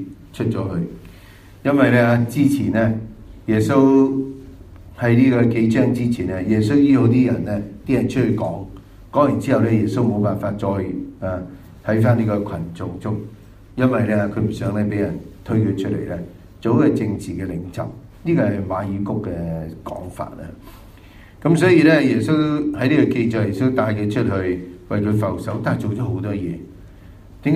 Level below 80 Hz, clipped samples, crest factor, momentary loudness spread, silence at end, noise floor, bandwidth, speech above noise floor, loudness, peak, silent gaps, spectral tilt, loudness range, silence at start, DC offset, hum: -46 dBFS; under 0.1%; 18 dB; 16 LU; 0 s; -43 dBFS; 14 kHz; 25 dB; -19 LUFS; 0 dBFS; none; -8 dB/octave; 6 LU; 0 s; under 0.1%; none